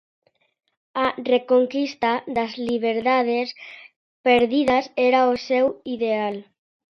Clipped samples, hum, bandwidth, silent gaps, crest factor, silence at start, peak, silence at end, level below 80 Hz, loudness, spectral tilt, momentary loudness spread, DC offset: under 0.1%; none; 6.6 kHz; 3.96-4.24 s; 18 dB; 0.95 s; -4 dBFS; 0.5 s; -60 dBFS; -21 LUFS; -5 dB/octave; 10 LU; under 0.1%